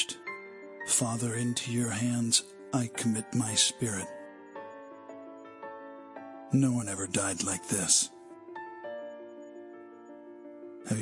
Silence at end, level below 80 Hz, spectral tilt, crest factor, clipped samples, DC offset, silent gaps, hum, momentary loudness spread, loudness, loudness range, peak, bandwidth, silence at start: 0 s; -72 dBFS; -3 dB/octave; 24 dB; under 0.1%; under 0.1%; none; none; 22 LU; -29 LUFS; 5 LU; -10 dBFS; 11.5 kHz; 0 s